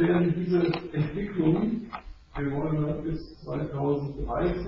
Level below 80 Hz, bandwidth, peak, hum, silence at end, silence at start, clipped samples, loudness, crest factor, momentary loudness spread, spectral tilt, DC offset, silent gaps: -44 dBFS; 5.8 kHz; -12 dBFS; none; 0 s; 0 s; under 0.1%; -28 LUFS; 16 dB; 11 LU; -7.5 dB/octave; under 0.1%; none